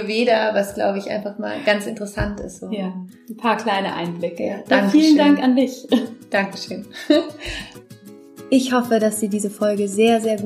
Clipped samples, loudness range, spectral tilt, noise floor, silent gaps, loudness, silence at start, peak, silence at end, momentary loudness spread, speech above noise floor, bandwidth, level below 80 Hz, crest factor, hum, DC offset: under 0.1%; 6 LU; -5 dB/octave; -42 dBFS; none; -19 LUFS; 0 s; -2 dBFS; 0 s; 15 LU; 23 dB; 15.5 kHz; -46 dBFS; 18 dB; none; under 0.1%